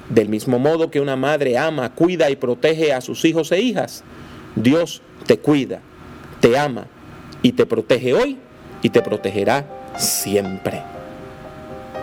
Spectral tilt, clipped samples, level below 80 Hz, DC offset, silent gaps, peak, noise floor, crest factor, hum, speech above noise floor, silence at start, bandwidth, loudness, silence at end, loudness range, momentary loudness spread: -5 dB/octave; under 0.1%; -52 dBFS; under 0.1%; none; 0 dBFS; -38 dBFS; 20 dB; none; 20 dB; 0.05 s; 17.5 kHz; -19 LUFS; 0 s; 2 LU; 19 LU